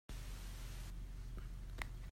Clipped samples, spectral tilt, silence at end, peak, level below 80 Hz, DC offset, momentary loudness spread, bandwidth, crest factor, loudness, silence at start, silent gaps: under 0.1%; -4.5 dB/octave; 0 s; -24 dBFS; -48 dBFS; under 0.1%; 3 LU; 16 kHz; 24 dB; -51 LUFS; 0.1 s; none